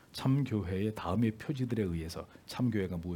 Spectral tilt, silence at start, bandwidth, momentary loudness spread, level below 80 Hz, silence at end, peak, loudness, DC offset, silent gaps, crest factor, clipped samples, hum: -7.5 dB/octave; 0.15 s; 18 kHz; 9 LU; -60 dBFS; 0 s; -18 dBFS; -34 LUFS; under 0.1%; none; 16 dB; under 0.1%; none